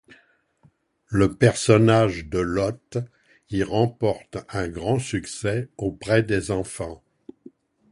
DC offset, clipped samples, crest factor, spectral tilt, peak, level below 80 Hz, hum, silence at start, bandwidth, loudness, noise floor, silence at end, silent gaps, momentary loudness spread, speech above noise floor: under 0.1%; under 0.1%; 22 dB; -6 dB/octave; -2 dBFS; -46 dBFS; none; 1.1 s; 11.5 kHz; -23 LUFS; -61 dBFS; 0.95 s; none; 14 LU; 39 dB